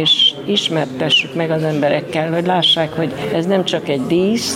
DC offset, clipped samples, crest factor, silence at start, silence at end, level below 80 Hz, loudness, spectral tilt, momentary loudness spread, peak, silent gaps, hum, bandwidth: under 0.1%; under 0.1%; 12 dB; 0 s; 0 s; -56 dBFS; -16 LUFS; -4.5 dB/octave; 7 LU; -4 dBFS; none; none; 16.5 kHz